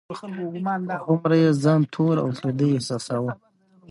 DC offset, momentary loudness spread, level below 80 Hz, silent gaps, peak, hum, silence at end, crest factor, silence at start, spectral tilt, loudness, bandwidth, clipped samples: under 0.1%; 13 LU; -66 dBFS; none; -8 dBFS; none; 0.55 s; 16 dB; 0.1 s; -7 dB/octave; -23 LUFS; 11.5 kHz; under 0.1%